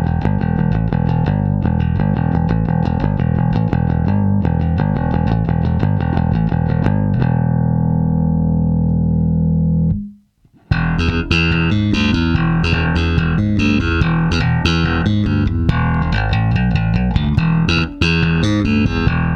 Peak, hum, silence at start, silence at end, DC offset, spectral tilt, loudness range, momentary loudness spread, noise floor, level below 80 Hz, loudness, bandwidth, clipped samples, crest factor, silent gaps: -2 dBFS; none; 0 s; 0 s; under 0.1%; -7.5 dB/octave; 1 LU; 2 LU; -52 dBFS; -24 dBFS; -16 LUFS; 6.6 kHz; under 0.1%; 14 dB; none